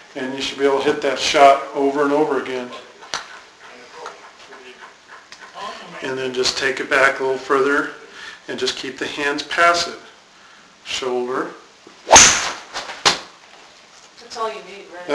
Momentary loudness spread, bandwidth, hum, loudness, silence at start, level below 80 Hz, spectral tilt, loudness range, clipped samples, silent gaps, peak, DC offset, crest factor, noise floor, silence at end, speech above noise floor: 23 LU; 11 kHz; none; -17 LUFS; 0.15 s; -50 dBFS; -1 dB/octave; 12 LU; under 0.1%; none; 0 dBFS; under 0.1%; 20 dB; -47 dBFS; 0 s; 28 dB